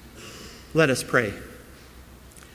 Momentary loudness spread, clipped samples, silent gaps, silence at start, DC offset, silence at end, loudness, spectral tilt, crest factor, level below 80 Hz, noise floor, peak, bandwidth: 25 LU; under 0.1%; none; 0.05 s; under 0.1%; 0.15 s; -23 LUFS; -4.5 dB/octave; 24 dB; -50 dBFS; -47 dBFS; -4 dBFS; 16 kHz